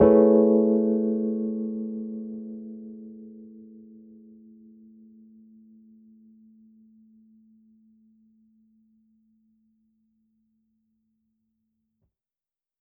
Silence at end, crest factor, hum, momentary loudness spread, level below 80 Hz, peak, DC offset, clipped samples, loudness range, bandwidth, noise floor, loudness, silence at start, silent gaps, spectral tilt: 9.2 s; 22 dB; none; 28 LU; -60 dBFS; -6 dBFS; under 0.1%; under 0.1%; 29 LU; 2.6 kHz; under -90 dBFS; -23 LUFS; 0 s; none; -8 dB/octave